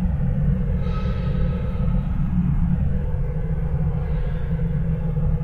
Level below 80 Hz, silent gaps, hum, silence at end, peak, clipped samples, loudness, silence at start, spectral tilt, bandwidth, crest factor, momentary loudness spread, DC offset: -24 dBFS; none; none; 0 s; -10 dBFS; under 0.1%; -24 LUFS; 0 s; -10.5 dB/octave; 4.7 kHz; 12 dB; 4 LU; under 0.1%